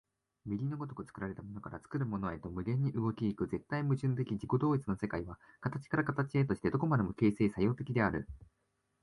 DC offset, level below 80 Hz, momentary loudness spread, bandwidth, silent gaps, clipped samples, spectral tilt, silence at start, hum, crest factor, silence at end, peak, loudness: under 0.1%; -58 dBFS; 11 LU; 11.5 kHz; none; under 0.1%; -9 dB/octave; 0.45 s; none; 18 dB; 0.6 s; -16 dBFS; -35 LUFS